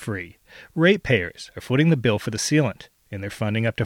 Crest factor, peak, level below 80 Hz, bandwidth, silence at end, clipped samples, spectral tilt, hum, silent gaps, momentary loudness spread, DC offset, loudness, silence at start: 20 dB; -4 dBFS; -52 dBFS; 16 kHz; 0 s; under 0.1%; -5.5 dB/octave; none; none; 18 LU; under 0.1%; -22 LUFS; 0 s